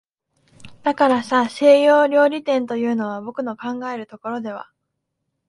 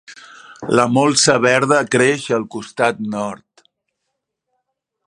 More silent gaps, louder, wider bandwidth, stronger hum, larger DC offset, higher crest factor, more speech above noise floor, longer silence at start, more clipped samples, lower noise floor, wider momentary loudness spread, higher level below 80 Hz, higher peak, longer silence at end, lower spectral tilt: neither; second, -19 LUFS vs -16 LUFS; about the same, 11.5 kHz vs 11.5 kHz; neither; neither; about the same, 18 dB vs 18 dB; about the same, 58 dB vs 60 dB; first, 0.6 s vs 0.1 s; neither; about the same, -76 dBFS vs -76 dBFS; first, 16 LU vs 13 LU; about the same, -66 dBFS vs -62 dBFS; about the same, -2 dBFS vs 0 dBFS; second, 0.85 s vs 1.7 s; first, -5 dB/octave vs -3.5 dB/octave